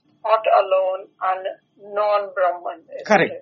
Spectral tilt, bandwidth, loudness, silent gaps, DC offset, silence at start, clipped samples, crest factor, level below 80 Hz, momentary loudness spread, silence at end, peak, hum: -2.5 dB/octave; 7 kHz; -20 LUFS; none; under 0.1%; 0.25 s; under 0.1%; 20 dB; -70 dBFS; 14 LU; 0 s; 0 dBFS; none